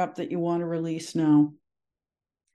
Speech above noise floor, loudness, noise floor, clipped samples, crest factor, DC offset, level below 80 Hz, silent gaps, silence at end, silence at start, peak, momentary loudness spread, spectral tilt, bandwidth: over 65 dB; -26 LUFS; under -90 dBFS; under 0.1%; 16 dB; under 0.1%; -78 dBFS; none; 1 s; 0 s; -10 dBFS; 8 LU; -7 dB/octave; 11 kHz